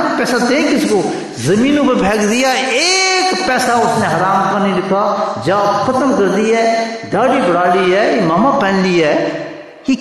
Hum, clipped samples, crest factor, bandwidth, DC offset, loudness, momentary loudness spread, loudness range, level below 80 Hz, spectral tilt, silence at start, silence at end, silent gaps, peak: none; under 0.1%; 10 dB; 12.5 kHz; under 0.1%; -13 LUFS; 5 LU; 1 LU; -48 dBFS; -4 dB/octave; 0 s; 0 s; none; -2 dBFS